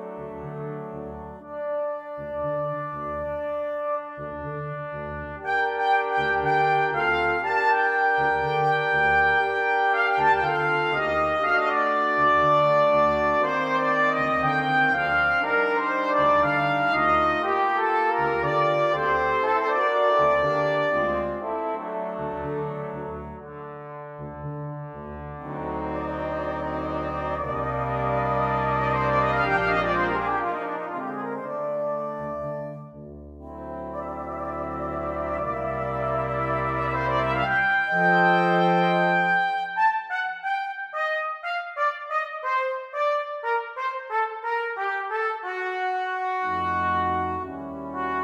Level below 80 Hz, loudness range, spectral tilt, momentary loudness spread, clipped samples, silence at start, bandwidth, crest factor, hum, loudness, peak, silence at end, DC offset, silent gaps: -48 dBFS; 11 LU; -6.5 dB/octave; 14 LU; under 0.1%; 0 s; 8.8 kHz; 16 dB; none; -24 LUFS; -8 dBFS; 0 s; under 0.1%; none